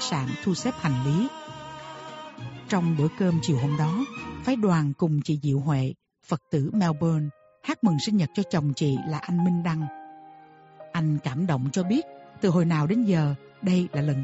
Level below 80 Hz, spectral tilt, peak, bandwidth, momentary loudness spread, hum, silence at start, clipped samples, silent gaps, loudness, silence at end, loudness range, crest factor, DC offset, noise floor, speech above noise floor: -58 dBFS; -7 dB/octave; -10 dBFS; 8 kHz; 16 LU; none; 0 s; under 0.1%; none; -26 LUFS; 0 s; 3 LU; 16 dB; under 0.1%; -50 dBFS; 26 dB